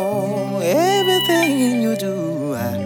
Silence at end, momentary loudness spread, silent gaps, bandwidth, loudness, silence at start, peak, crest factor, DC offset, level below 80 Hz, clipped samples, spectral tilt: 0 s; 8 LU; none; over 20 kHz; -18 LUFS; 0 s; -4 dBFS; 14 dB; under 0.1%; -68 dBFS; under 0.1%; -4.5 dB/octave